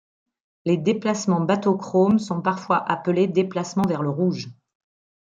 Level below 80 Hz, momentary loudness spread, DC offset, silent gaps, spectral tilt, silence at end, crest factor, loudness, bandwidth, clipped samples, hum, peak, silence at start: -66 dBFS; 5 LU; under 0.1%; none; -6.5 dB/octave; 0.7 s; 16 dB; -22 LUFS; 9 kHz; under 0.1%; none; -6 dBFS; 0.65 s